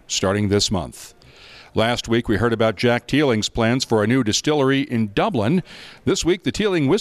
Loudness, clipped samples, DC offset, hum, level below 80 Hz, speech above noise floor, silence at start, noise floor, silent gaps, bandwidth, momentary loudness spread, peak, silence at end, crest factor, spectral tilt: -20 LUFS; under 0.1%; under 0.1%; none; -44 dBFS; 25 dB; 0.1 s; -45 dBFS; none; 14 kHz; 5 LU; -8 dBFS; 0 s; 12 dB; -5 dB/octave